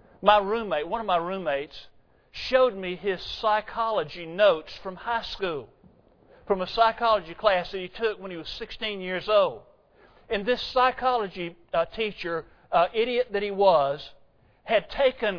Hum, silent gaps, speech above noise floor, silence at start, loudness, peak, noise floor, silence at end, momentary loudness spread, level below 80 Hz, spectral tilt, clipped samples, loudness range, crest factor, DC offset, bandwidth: none; none; 32 dB; 0.2 s; -26 LUFS; -4 dBFS; -57 dBFS; 0 s; 14 LU; -52 dBFS; -5.5 dB/octave; under 0.1%; 2 LU; 22 dB; under 0.1%; 5.4 kHz